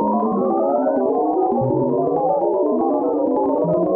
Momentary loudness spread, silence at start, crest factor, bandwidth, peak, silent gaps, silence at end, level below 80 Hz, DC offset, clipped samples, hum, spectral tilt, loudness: 1 LU; 0 s; 10 dB; 2.6 kHz; -8 dBFS; none; 0 s; -56 dBFS; under 0.1%; under 0.1%; none; -13.5 dB/octave; -19 LUFS